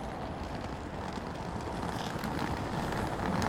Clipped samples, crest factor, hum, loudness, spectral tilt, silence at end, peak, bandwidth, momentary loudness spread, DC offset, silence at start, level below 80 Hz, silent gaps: under 0.1%; 18 dB; none; -36 LUFS; -5.5 dB/octave; 0 s; -16 dBFS; 17 kHz; 5 LU; under 0.1%; 0 s; -46 dBFS; none